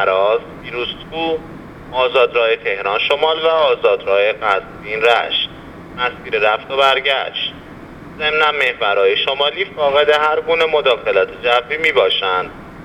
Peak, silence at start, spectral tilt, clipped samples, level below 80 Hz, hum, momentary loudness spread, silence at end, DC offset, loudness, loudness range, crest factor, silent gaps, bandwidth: 0 dBFS; 0 s; -4 dB/octave; under 0.1%; -48 dBFS; none; 11 LU; 0 s; under 0.1%; -16 LUFS; 3 LU; 16 dB; none; 10.5 kHz